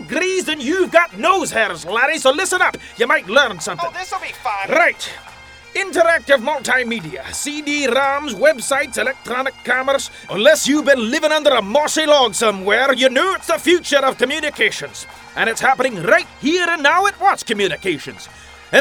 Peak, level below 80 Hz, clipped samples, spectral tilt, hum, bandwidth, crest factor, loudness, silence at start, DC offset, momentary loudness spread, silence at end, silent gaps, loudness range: 0 dBFS; -52 dBFS; under 0.1%; -2 dB/octave; none; over 20 kHz; 18 dB; -16 LUFS; 0 s; under 0.1%; 10 LU; 0 s; none; 4 LU